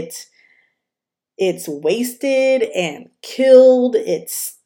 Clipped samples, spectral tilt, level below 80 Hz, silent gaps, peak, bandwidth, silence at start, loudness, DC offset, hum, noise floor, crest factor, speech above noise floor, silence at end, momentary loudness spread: under 0.1%; -4 dB/octave; -78 dBFS; none; 0 dBFS; 17.5 kHz; 0 s; -16 LUFS; under 0.1%; none; -86 dBFS; 16 dB; 70 dB; 0.15 s; 20 LU